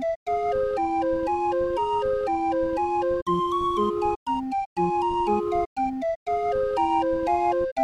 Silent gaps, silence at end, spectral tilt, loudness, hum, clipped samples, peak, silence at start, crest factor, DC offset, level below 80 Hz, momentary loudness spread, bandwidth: 0.16-0.26 s, 3.22-3.26 s, 4.16-4.26 s, 4.66-4.76 s, 5.66-5.76 s, 6.16-6.26 s, 7.72-7.76 s; 0 s; -7 dB/octave; -25 LUFS; none; under 0.1%; -12 dBFS; 0 s; 12 dB; under 0.1%; -48 dBFS; 4 LU; 10.5 kHz